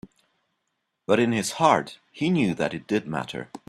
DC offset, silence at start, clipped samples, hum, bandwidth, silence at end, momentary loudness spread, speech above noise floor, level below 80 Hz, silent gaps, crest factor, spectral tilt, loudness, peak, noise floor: under 0.1%; 1.1 s; under 0.1%; none; 14 kHz; 0.1 s; 12 LU; 54 dB; -64 dBFS; none; 22 dB; -5 dB/octave; -24 LUFS; -4 dBFS; -78 dBFS